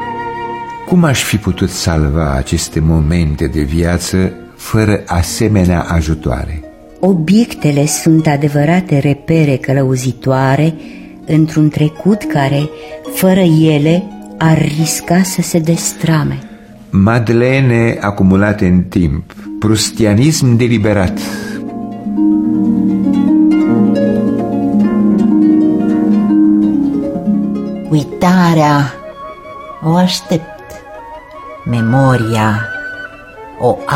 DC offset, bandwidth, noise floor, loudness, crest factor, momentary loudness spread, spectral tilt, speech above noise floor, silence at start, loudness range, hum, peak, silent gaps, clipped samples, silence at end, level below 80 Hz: under 0.1%; 16.5 kHz; -32 dBFS; -12 LUFS; 12 dB; 13 LU; -6 dB/octave; 21 dB; 0 s; 3 LU; none; 0 dBFS; none; under 0.1%; 0 s; -30 dBFS